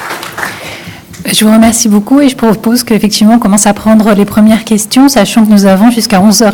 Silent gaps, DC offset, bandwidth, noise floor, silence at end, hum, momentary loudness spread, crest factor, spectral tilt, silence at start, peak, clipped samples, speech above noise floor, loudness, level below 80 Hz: none; 0.3%; over 20 kHz; -26 dBFS; 0 s; none; 13 LU; 6 dB; -4.5 dB/octave; 0 s; 0 dBFS; 6%; 20 dB; -6 LUFS; -38 dBFS